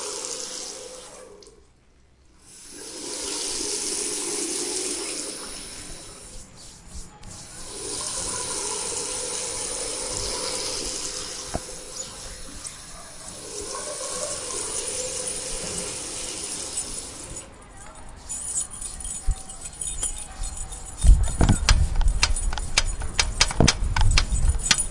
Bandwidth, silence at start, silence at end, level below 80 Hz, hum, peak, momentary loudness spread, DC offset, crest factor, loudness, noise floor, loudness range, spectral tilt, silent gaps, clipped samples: 11.5 kHz; 0 s; 0 s; -30 dBFS; none; 0 dBFS; 19 LU; under 0.1%; 26 dB; -26 LUFS; -56 dBFS; 10 LU; -2.5 dB/octave; none; under 0.1%